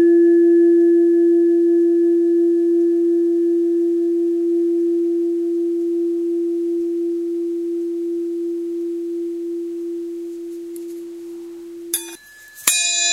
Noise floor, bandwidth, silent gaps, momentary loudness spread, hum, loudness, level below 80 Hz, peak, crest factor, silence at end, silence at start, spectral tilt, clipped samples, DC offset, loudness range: -42 dBFS; 16 kHz; none; 17 LU; none; -18 LUFS; -66 dBFS; 0 dBFS; 18 dB; 0 s; 0 s; -1.5 dB/octave; under 0.1%; under 0.1%; 12 LU